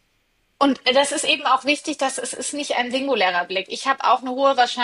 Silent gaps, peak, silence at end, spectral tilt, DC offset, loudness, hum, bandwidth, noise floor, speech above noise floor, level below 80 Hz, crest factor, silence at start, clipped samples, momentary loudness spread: none; -4 dBFS; 0 s; -1 dB/octave; under 0.1%; -20 LUFS; none; 11.5 kHz; -66 dBFS; 45 dB; -72 dBFS; 16 dB; 0.6 s; under 0.1%; 6 LU